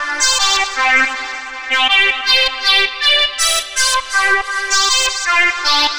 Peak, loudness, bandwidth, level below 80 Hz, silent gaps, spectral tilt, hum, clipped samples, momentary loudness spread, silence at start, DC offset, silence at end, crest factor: -2 dBFS; -12 LUFS; over 20 kHz; -42 dBFS; none; 2 dB/octave; none; under 0.1%; 4 LU; 0 s; under 0.1%; 0 s; 14 dB